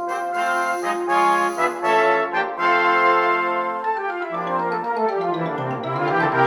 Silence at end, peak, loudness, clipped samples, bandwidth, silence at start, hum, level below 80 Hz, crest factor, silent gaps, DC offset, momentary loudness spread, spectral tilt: 0 s; -4 dBFS; -20 LUFS; under 0.1%; 17.5 kHz; 0 s; none; -74 dBFS; 16 dB; none; under 0.1%; 8 LU; -5 dB/octave